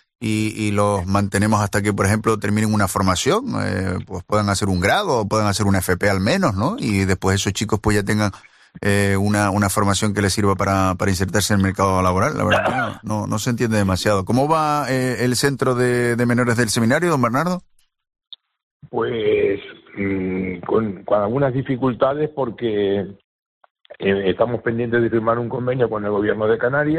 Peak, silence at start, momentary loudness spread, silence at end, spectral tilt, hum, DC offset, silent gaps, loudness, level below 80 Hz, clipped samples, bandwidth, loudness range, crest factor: -4 dBFS; 0.2 s; 6 LU; 0 s; -5.5 dB/octave; none; under 0.1%; 18.63-18.80 s, 23.24-23.61 s, 23.71-23.75 s; -19 LUFS; -48 dBFS; under 0.1%; 14.5 kHz; 4 LU; 16 dB